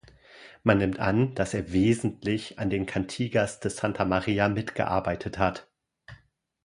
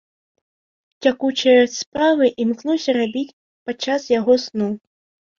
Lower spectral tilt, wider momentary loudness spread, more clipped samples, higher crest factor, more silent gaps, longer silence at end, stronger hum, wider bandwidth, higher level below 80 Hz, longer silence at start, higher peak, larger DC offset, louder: first, -6 dB/octave vs -4 dB/octave; second, 6 LU vs 13 LU; neither; first, 24 dB vs 18 dB; second, none vs 1.87-1.92 s, 3.33-3.66 s; about the same, 0.5 s vs 0.6 s; neither; first, 11.5 kHz vs 7.4 kHz; first, -48 dBFS vs -62 dBFS; second, 0.35 s vs 1 s; about the same, -4 dBFS vs -2 dBFS; neither; second, -27 LUFS vs -19 LUFS